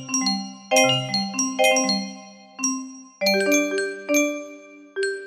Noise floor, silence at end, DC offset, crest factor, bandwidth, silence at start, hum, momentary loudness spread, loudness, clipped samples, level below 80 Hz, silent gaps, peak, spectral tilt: -43 dBFS; 0 s; under 0.1%; 18 dB; 15.5 kHz; 0 s; none; 17 LU; -21 LUFS; under 0.1%; -70 dBFS; none; -6 dBFS; -2.5 dB/octave